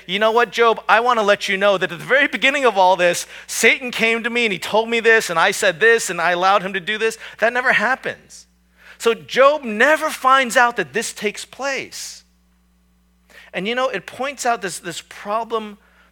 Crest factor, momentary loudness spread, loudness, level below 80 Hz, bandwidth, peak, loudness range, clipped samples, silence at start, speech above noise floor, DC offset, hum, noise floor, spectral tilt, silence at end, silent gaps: 18 dB; 12 LU; -17 LUFS; -60 dBFS; 19 kHz; 0 dBFS; 10 LU; under 0.1%; 0.1 s; 40 dB; under 0.1%; none; -58 dBFS; -2.5 dB/octave; 0.35 s; none